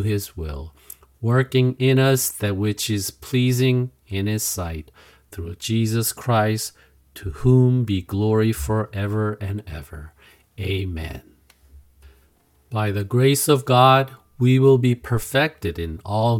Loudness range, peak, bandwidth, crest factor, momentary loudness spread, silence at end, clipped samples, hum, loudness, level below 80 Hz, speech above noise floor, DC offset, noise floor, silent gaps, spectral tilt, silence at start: 11 LU; 0 dBFS; 17 kHz; 22 dB; 17 LU; 0 s; under 0.1%; none; -21 LUFS; -44 dBFS; 39 dB; under 0.1%; -59 dBFS; none; -5.5 dB/octave; 0 s